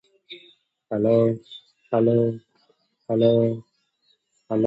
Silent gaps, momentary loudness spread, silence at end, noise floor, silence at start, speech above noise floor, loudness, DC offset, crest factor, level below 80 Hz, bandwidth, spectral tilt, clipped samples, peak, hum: none; 24 LU; 0 s; -68 dBFS; 0.3 s; 47 dB; -22 LUFS; under 0.1%; 18 dB; -64 dBFS; 7.6 kHz; -10 dB/octave; under 0.1%; -6 dBFS; none